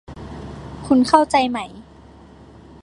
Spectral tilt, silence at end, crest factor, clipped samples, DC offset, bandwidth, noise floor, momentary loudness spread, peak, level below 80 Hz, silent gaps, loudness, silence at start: -5 dB/octave; 1 s; 20 dB; under 0.1%; under 0.1%; 11.5 kHz; -44 dBFS; 20 LU; 0 dBFS; -44 dBFS; none; -17 LUFS; 0.1 s